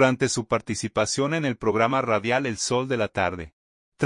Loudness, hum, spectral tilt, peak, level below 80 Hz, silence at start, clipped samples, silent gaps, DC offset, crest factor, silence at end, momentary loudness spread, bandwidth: -24 LUFS; none; -4.5 dB/octave; -6 dBFS; -56 dBFS; 0 s; under 0.1%; 3.53-3.92 s; under 0.1%; 18 dB; 0 s; 5 LU; 11 kHz